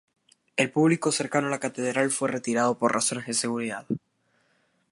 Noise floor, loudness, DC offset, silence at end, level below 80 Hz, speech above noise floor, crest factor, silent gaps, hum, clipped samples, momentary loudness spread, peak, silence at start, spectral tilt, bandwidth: -69 dBFS; -26 LUFS; under 0.1%; 0.95 s; -72 dBFS; 43 dB; 20 dB; none; none; under 0.1%; 9 LU; -8 dBFS; 0.55 s; -4 dB/octave; 11.5 kHz